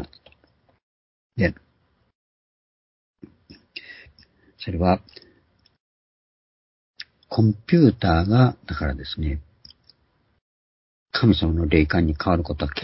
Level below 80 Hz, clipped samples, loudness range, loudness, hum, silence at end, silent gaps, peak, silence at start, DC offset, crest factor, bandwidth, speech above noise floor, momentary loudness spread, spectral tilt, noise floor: -36 dBFS; under 0.1%; 11 LU; -21 LUFS; none; 0 s; 0.83-1.30 s, 2.15-3.14 s, 5.80-6.94 s, 10.41-11.06 s; -2 dBFS; 0 s; under 0.1%; 22 dB; 5.8 kHz; 46 dB; 22 LU; -11 dB/octave; -66 dBFS